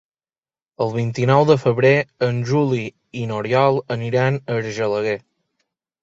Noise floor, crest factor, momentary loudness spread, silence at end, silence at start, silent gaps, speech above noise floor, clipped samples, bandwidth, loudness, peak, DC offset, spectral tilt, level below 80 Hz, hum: under -90 dBFS; 18 dB; 10 LU; 0.85 s; 0.8 s; none; over 72 dB; under 0.1%; 7.8 kHz; -19 LUFS; -2 dBFS; under 0.1%; -7 dB/octave; -58 dBFS; none